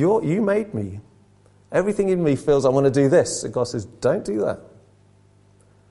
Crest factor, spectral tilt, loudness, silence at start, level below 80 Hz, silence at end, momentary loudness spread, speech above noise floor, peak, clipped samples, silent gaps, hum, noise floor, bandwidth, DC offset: 16 dB; -6 dB/octave; -21 LUFS; 0 s; -52 dBFS; 1.3 s; 12 LU; 35 dB; -6 dBFS; under 0.1%; none; 50 Hz at -50 dBFS; -55 dBFS; 11.5 kHz; under 0.1%